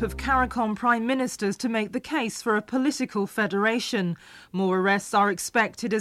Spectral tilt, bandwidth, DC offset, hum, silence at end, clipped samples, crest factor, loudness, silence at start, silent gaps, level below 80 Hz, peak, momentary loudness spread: -4.5 dB/octave; 15 kHz; under 0.1%; none; 0 s; under 0.1%; 16 dB; -25 LUFS; 0 s; none; -46 dBFS; -8 dBFS; 5 LU